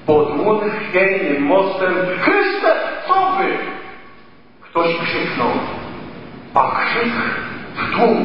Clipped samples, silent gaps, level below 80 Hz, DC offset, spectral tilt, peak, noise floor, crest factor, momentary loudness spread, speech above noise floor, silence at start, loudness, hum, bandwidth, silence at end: under 0.1%; none; -52 dBFS; 1%; -8 dB/octave; 0 dBFS; -46 dBFS; 18 dB; 13 LU; 30 dB; 0 s; -17 LUFS; none; 5.8 kHz; 0 s